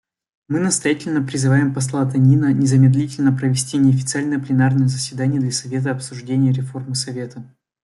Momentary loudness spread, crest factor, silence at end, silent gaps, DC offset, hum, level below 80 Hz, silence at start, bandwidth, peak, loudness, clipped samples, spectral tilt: 10 LU; 14 dB; 0.35 s; none; under 0.1%; none; -58 dBFS; 0.5 s; 12 kHz; -4 dBFS; -18 LUFS; under 0.1%; -6 dB/octave